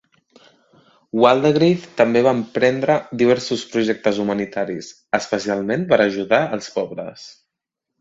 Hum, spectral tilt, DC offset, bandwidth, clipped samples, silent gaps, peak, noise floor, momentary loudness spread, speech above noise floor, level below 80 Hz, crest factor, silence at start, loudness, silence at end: none; -5.5 dB/octave; under 0.1%; 8 kHz; under 0.1%; none; 0 dBFS; -82 dBFS; 11 LU; 64 dB; -60 dBFS; 20 dB; 1.15 s; -19 LUFS; 0.7 s